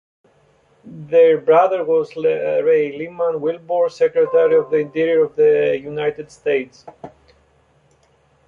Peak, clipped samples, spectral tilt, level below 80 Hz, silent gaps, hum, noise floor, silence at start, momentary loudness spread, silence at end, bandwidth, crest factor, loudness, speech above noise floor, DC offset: -2 dBFS; under 0.1%; -6.5 dB/octave; -64 dBFS; none; none; -57 dBFS; 0.85 s; 10 LU; 1.4 s; 7 kHz; 16 dB; -17 LUFS; 41 dB; under 0.1%